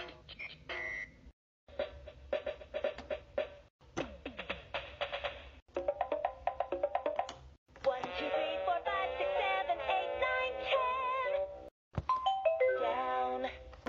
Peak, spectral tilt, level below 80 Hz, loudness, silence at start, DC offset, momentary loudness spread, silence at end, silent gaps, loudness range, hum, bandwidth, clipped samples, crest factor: -18 dBFS; -1.5 dB/octave; -58 dBFS; -36 LUFS; 0 s; under 0.1%; 12 LU; 0.05 s; 1.33-1.67 s, 3.70-3.79 s, 5.62-5.66 s, 7.58-7.66 s, 11.71-11.91 s; 8 LU; none; 7.6 kHz; under 0.1%; 18 dB